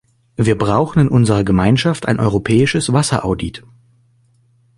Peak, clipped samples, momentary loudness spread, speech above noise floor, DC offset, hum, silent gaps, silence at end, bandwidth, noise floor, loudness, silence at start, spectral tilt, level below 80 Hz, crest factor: 0 dBFS; under 0.1%; 7 LU; 41 dB; under 0.1%; none; none; 1.2 s; 11.5 kHz; -55 dBFS; -15 LUFS; 0.4 s; -6 dB/octave; -38 dBFS; 16 dB